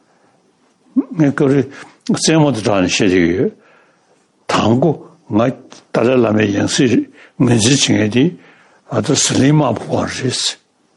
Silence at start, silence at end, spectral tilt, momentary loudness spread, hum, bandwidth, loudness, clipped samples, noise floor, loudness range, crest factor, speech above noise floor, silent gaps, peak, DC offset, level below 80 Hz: 0.95 s; 0.45 s; -4.5 dB/octave; 9 LU; none; 12 kHz; -15 LUFS; under 0.1%; -56 dBFS; 3 LU; 14 dB; 42 dB; none; -2 dBFS; under 0.1%; -54 dBFS